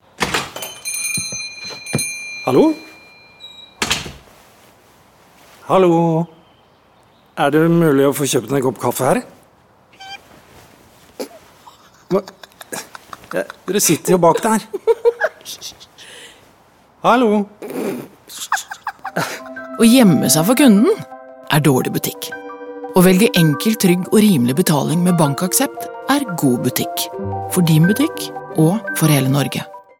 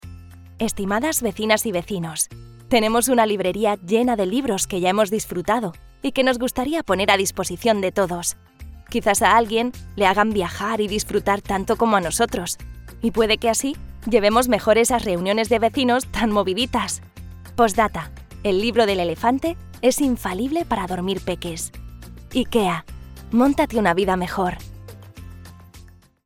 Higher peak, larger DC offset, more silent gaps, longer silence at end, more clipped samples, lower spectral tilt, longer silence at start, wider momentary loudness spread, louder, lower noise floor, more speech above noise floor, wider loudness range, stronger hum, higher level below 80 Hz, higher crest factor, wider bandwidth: about the same, 0 dBFS vs -2 dBFS; neither; neither; second, 0.2 s vs 0.35 s; neither; about the same, -5 dB/octave vs -4 dB/octave; first, 0.2 s vs 0.05 s; first, 18 LU vs 13 LU; first, -16 LUFS vs -21 LUFS; first, -51 dBFS vs -46 dBFS; first, 37 dB vs 26 dB; first, 9 LU vs 4 LU; neither; second, -54 dBFS vs -42 dBFS; about the same, 16 dB vs 20 dB; about the same, 17.5 kHz vs 18 kHz